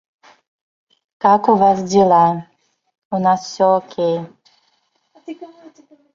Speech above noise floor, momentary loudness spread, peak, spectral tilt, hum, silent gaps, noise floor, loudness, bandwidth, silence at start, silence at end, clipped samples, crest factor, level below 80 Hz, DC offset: 49 dB; 22 LU; -2 dBFS; -6 dB/octave; none; 2.98-3.11 s; -64 dBFS; -16 LUFS; 7.6 kHz; 1.25 s; 0.7 s; under 0.1%; 16 dB; -60 dBFS; under 0.1%